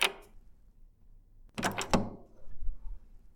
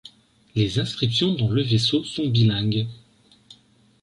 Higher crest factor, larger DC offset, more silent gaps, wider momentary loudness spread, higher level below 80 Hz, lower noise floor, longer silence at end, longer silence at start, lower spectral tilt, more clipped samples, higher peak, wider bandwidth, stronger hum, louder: first, 28 dB vs 16 dB; neither; neither; first, 22 LU vs 6 LU; first, -44 dBFS vs -50 dBFS; about the same, -57 dBFS vs -57 dBFS; second, 0.05 s vs 1.05 s; about the same, 0 s vs 0.05 s; second, -3.5 dB/octave vs -6 dB/octave; neither; about the same, -8 dBFS vs -8 dBFS; first, 18.5 kHz vs 11 kHz; neither; second, -35 LUFS vs -22 LUFS